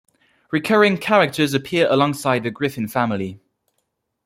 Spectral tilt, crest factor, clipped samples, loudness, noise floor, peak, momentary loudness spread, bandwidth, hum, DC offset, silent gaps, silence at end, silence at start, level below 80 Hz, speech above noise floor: -5.5 dB/octave; 18 dB; under 0.1%; -19 LUFS; -73 dBFS; -2 dBFS; 9 LU; 16.5 kHz; none; under 0.1%; none; 0.9 s; 0.5 s; -60 dBFS; 55 dB